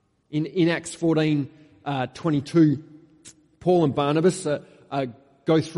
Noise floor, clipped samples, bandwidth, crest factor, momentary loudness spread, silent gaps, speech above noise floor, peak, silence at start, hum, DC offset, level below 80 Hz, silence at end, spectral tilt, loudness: -51 dBFS; under 0.1%; 11.5 kHz; 16 dB; 11 LU; none; 29 dB; -8 dBFS; 0.3 s; none; under 0.1%; -62 dBFS; 0 s; -6.5 dB/octave; -24 LUFS